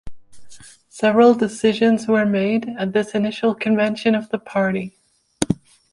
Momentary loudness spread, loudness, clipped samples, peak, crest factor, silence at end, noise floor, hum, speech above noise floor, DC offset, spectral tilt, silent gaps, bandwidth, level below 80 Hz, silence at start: 10 LU; -19 LUFS; under 0.1%; -2 dBFS; 18 dB; 0.4 s; -42 dBFS; none; 24 dB; under 0.1%; -5.5 dB/octave; none; 11.5 kHz; -52 dBFS; 0.05 s